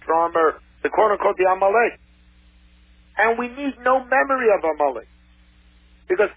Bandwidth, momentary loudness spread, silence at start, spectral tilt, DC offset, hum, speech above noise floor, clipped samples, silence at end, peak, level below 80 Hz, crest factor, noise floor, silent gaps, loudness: 4 kHz; 8 LU; 0.05 s; -8 dB/octave; under 0.1%; none; 33 dB; under 0.1%; 0.05 s; -4 dBFS; -52 dBFS; 16 dB; -53 dBFS; none; -20 LUFS